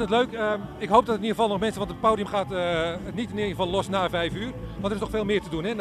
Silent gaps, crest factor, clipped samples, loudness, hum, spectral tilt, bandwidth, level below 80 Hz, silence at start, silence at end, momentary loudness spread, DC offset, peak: none; 20 dB; under 0.1%; -26 LUFS; none; -5.5 dB/octave; 14.5 kHz; -46 dBFS; 0 s; 0 s; 9 LU; under 0.1%; -4 dBFS